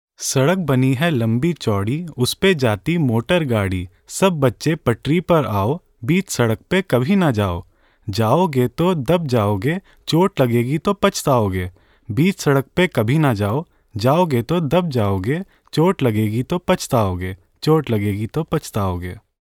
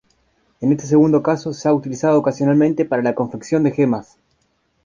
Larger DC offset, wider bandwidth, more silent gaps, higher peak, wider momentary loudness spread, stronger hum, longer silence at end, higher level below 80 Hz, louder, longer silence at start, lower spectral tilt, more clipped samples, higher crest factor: neither; first, 18.5 kHz vs 7.4 kHz; neither; about the same, -2 dBFS vs -2 dBFS; about the same, 8 LU vs 6 LU; neither; second, 0.25 s vs 0.8 s; first, -46 dBFS vs -56 dBFS; about the same, -19 LUFS vs -18 LUFS; second, 0.2 s vs 0.6 s; second, -6 dB/octave vs -7.5 dB/octave; neither; about the same, 16 dB vs 14 dB